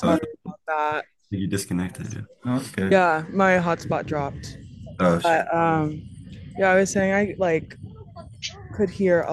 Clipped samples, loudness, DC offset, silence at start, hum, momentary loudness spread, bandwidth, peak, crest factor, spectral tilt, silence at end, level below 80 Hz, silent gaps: under 0.1%; -23 LUFS; under 0.1%; 0 s; none; 20 LU; 12.5 kHz; -4 dBFS; 20 dB; -6 dB/octave; 0 s; -54 dBFS; none